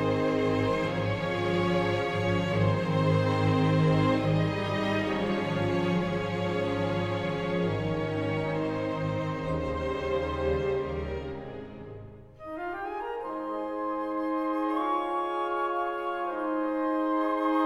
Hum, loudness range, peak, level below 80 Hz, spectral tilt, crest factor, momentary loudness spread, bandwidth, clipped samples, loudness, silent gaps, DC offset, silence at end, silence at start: none; 7 LU; -14 dBFS; -48 dBFS; -7.5 dB/octave; 14 dB; 9 LU; 11 kHz; under 0.1%; -29 LUFS; none; under 0.1%; 0 s; 0 s